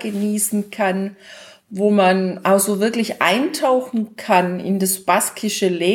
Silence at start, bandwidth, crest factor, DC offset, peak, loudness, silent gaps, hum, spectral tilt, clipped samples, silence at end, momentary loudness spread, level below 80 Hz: 0 s; 18.5 kHz; 18 dB; under 0.1%; -2 dBFS; -18 LUFS; none; none; -4 dB/octave; under 0.1%; 0 s; 6 LU; -70 dBFS